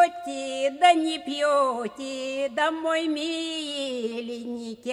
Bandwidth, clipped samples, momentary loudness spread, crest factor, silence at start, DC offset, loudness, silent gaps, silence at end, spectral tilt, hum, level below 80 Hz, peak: 12 kHz; under 0.1%; 13 LU; 20 dB; 0 s; under 0.1%; -26 LUFS; none; 0 s; -2.5 dB/octave; none; -72 dBFS; -6 dBFS